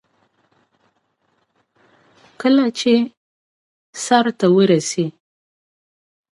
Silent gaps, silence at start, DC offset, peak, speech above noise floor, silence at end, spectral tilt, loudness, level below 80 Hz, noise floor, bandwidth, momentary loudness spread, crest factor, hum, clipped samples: 3.17-3.93 s; 2.4 s; under 0.1%; -2 dBFS; 51 dB; 1.3 s; -5 dB/octave; -17 LUFS; -70 dBFS; -66 dBFS; 11.5 kHz; 12 LU; 20 dB; none; under 0.1%